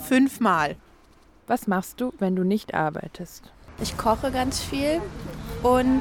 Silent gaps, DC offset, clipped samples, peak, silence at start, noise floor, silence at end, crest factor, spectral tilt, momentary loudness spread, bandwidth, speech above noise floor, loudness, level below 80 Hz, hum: none; under 0.1%; under 0.1%; -8 dBFS; 0 s; -54 dBFS; 0 s; 16 dB; -5.5 dB/octave; 15 LU; 18 kHz; 31 dB; -25 LUFS; -44 dBFS; none